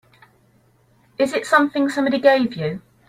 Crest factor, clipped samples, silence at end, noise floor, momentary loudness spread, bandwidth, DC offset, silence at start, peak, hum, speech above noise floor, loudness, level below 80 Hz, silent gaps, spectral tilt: 18 dB; under 0.1%; 0.3 s; -58 dBFS; 11 LU; 15 kHz; under 0.1%; 1.2 s; -2 dBFS; none; 40 dB; -19 LUFS; -62 dBFS; none; -5.5 dB/octave